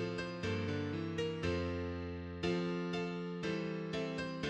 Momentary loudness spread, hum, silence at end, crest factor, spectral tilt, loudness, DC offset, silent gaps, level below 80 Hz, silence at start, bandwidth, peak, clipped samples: 4 LU; none; 0 s; 16 dB; -6.5 dB/octave; -39 LUFS; under 0.1%; none; -58 dBFS; 0 s; 9.4 kHz; -22 dBFS; under 0.1%